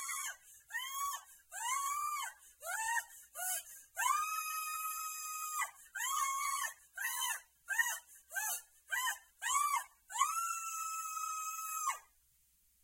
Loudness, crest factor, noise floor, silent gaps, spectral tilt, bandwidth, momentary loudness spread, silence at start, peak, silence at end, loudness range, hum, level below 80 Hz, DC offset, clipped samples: -38 LUFS; 22 dB; -72 dBFS; none; 5 dB/octave; 16.5 kHz; 10 LU; 0 s; -18 dBFS; 0.8 s; 2 LU; none; -82 dBFS; under 0.1%; under 0.1%